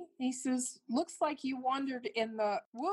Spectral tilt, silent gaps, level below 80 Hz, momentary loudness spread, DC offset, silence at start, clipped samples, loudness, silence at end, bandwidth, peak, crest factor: -3 dB/octave; 2.65-2.72 s; -86 dBFS; 3 LU; under 0.1%; 0 s; under 0.1%; -36 LUFS; 0 s; 12.5 kHz; -20 dBFS; 14 dB